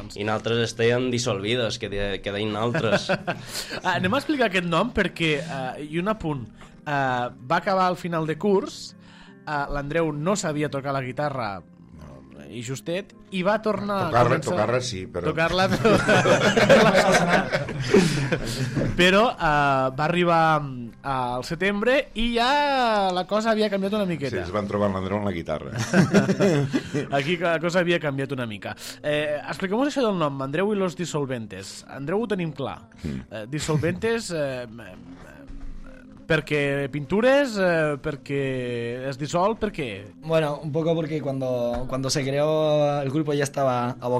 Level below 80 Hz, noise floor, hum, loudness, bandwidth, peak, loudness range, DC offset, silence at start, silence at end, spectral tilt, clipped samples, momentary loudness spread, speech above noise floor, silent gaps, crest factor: -46 dBFS; -47 dBFS; none; -23 LUFS; 15.5 kHz; -2 dBFS; 9 LU; under 0.1%; 0 s; 0 s; -5.5 dB/octave; under 0.1%; 13 LU; 24 dB; none; 20 dB